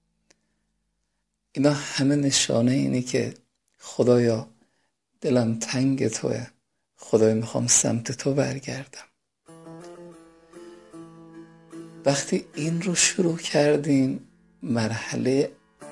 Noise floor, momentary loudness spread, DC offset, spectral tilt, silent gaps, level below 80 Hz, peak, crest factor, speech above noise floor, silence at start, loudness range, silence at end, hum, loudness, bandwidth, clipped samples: -77 dBFS; 23 LU; under 0.1%; -4.5 dB/octave; none; -64 dBFS; -6 dBFS; 20 dB; 54 dB; 1.55 s; 9 LU; 0 s; none; -23 LUFS; 11.5 kHz; under 0.1%